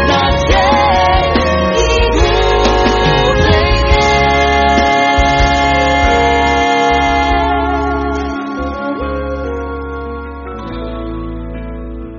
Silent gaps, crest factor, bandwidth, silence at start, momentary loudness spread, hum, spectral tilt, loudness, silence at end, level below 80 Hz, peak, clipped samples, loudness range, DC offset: none; 12 dB; 7.2 kHz; 0 s; 13 LU; none; -3.5 dB/octave; -12 LUFS; 0 s; -20 dBFS; 0 dBFS; under 0.1%; 10 LU; under 0.1%